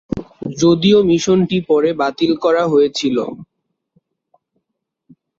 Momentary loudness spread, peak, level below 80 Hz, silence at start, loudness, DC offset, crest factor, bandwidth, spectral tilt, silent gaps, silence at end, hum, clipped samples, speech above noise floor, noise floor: 15 LU; -2 dBFS; -50 dBFS; 0.15 s; -15 LUFS; under 0.1%; 14 dB; 7.8 kHz; -5.5 dB/octave; none; 1.95 s; none; under 0.1%; 62 dB; -76 dBFS